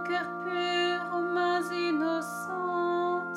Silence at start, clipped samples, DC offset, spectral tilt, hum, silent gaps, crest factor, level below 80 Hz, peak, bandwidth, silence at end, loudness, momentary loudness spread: 0 s; under 0.1%; under 0.1%; -4.5 dB/octave; none; none; 12 dB; -82 dBFS; -18 dBFS; 13.5 kHz; 0 s; -30 LUFS; 5 LU